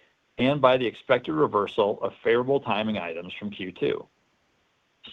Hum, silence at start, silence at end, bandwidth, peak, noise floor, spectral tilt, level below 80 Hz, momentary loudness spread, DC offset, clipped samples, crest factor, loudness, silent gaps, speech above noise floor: none; 0.4 s; 0 s; 6.8 kHz; -4 dBFS; -69 dBFS; -7.5 dB/octave; -64 dBFS; 13 LU; under 0.1%; under 0.1%; 22 dB; -25 LUFS; none; 44 dB